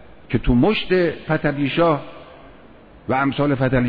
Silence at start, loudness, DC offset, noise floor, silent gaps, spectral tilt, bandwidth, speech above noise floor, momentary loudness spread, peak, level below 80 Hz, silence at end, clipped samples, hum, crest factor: 0 s; -20 LUFS; under 0.1%; -45 dBFS; none; -9.5 dB/octave; 5 kHz; 27 dB; 8 LU; -4 dBFS; -36 dBFS; 0 s; under 0.1%; none; 16 dB